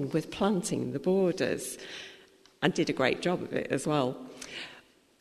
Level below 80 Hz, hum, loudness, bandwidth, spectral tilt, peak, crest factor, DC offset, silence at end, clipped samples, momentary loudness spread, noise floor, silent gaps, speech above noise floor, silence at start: -64 dBFS; none; -30 LUFS; 13.5 kHz; -5 dB/octave; -10 dBFS; 22 dB; under 0.1%; 0.4 s; under 0.1%; 14 LU; -57 dBFS; none; 27 dB; 0 s